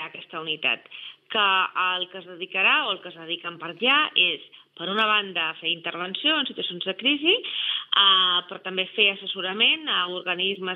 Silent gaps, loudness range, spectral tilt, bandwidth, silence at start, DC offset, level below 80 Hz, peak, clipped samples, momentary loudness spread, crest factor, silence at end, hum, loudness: none; 3 LU; -5.5 dB/octave; 5.6 kHz; 0 s; under 0.1%; under -90 dBFS; -6 dBFS; under 0.1%; 13 LU; 20 dB; 0 s; none; -22 LUFS